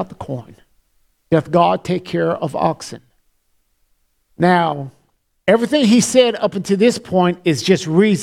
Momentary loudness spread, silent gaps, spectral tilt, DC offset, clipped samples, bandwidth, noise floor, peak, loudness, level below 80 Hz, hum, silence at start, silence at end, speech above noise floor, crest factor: 15 LU; none; -5.5 dB/octave; under 0.1%; under 0.1%; 14.5 kHz; -63 dBFS; 0 dBFS; -16 LUFS; -54 dBFS; none; 0 s; 0 s; 47 dB; 18 dB